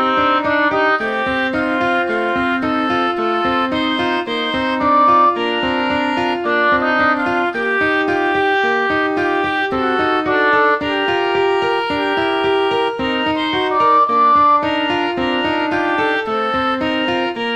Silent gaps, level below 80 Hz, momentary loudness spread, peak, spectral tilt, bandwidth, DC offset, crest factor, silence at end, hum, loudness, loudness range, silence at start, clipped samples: none; -48 dBFS; 5 LU; -4 dBFS; -5 dB/octave; 9.8 kHz; under 0.1%; 12 dB; 0 s; none; -16 LUFS; 2 LU; 0 s; under 0.1%